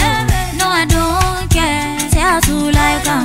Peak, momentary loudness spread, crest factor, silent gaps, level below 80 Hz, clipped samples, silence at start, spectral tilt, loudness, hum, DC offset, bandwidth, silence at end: 0 dBFS; 3 LU; 14 dB; none; -22 dBFS; under 0.1%; 0 s; -4 dB/octave; -14 LUFS; none; 0.3%; 16 kHz; 0 s